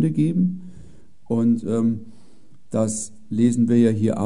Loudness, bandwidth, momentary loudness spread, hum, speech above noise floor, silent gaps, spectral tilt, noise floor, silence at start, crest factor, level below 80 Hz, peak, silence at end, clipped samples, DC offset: -21 LUFS; 11 kHz; 11 LU; none; 35 dB; none; -7.5 dB/octave; -55 dBFS; 0 s; 16 dB; -58 dBFS; -6 dBFS; 0 s; under 0.1%; 1%